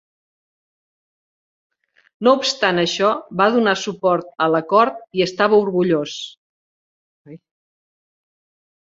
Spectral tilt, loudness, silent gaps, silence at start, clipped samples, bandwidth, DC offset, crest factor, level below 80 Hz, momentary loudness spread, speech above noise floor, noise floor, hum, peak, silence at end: -4.5 dB/octave; -18 LUFS; 6.37-7.25 s; 2.2 s; under 0.1%; 8 kHz; under 0.1%; 20 dB; -64 dBFS; 6 LU; over 72 dB; under -90 dBFS; none; -2 dBFS; 1.45 s